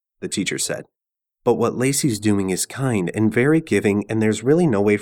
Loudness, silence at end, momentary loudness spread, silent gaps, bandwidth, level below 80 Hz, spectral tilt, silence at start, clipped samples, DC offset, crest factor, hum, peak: -20 LUFS; 0 s; 7 LU; none; 19.5 kHz; -56 dBFS; -5 dB/octave; 0.2 s; under 0.1%; under 0.1%; 16 dB; none; -4 dBFS